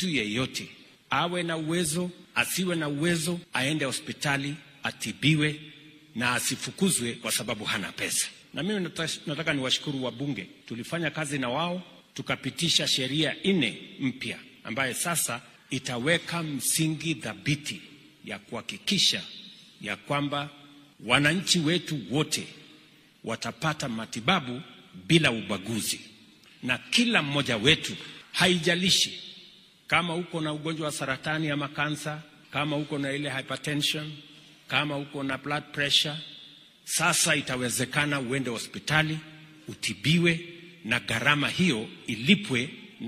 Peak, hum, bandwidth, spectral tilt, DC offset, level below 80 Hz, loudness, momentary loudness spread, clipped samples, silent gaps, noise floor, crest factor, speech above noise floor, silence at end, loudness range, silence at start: -4 dBFS; none; 15.5 kHz; -3.5 dB/octave; under 0.1%; -62 dBFS; -27 LUFS; 15 LU; under 0.1%; none; -56 dBFS; 24 dB; 28 dB; 0 s; 5 LU; 0 s